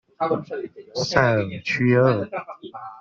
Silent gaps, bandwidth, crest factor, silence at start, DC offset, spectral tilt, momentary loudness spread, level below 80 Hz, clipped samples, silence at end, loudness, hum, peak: none; 7.4 kHz; 20 dB; 0.2 s; under 0.1%; -6 dB/octave; 17 LU; -56 dBFS; under 0.1%; 0 s; -22 LUFS; none; -4 dBFS